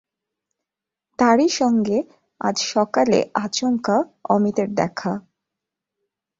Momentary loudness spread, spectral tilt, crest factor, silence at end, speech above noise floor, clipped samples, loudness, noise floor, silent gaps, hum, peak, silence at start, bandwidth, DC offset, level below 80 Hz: 10 LU; -4.5 dB/octave; 18 dB; 1.2 s; 67 dB; under 0.1%; -20 LUFS; -86 dBFS; none; none; -4 dBFS; 1.2 s; 7.8 kHz; under 0.1%; -62 dBFS